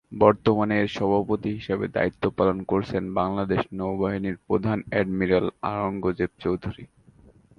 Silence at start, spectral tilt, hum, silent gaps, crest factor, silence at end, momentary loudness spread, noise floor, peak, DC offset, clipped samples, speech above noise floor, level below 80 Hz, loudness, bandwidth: 0.1 s; -8.5 dB/octave; none; none; 22 dB; 0.75 s; 6 LU; -54 dBFS; -2 dBFS; under 0.1%; under 0.1%; 30 dB; -50 dBFS; -25 LUFS; 7 kHz